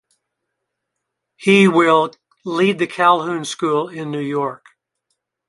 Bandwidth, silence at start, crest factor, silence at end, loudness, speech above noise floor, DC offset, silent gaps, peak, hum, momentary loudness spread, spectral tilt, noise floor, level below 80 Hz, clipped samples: 11.5 kHz; 1.4 s; 18 dB; 0.9 s; -17 LUFS; 62 dB; under 0.1%; none; -2 dBFS; none; 13 LU; -5.5 dB/octave; -78 dBFS; -66 dBFS; under 0.1%